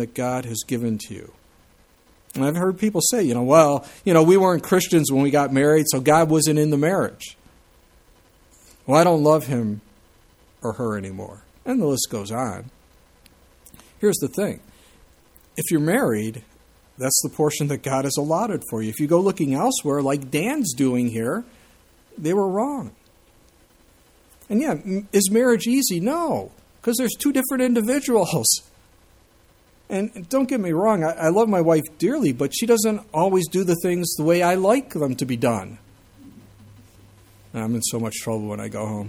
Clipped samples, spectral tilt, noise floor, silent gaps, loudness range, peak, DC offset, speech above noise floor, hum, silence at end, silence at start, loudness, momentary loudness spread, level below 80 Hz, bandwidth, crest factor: under 0.1%; -5 dB/octave; -56 dBFS; none; 10 LU; -2 dBFS; under 0.1%; 35 dB; none; 0 s; 0 s; -21 LUFS; 12 LU; -58 dBFS; 18.5 kHz; 20 dB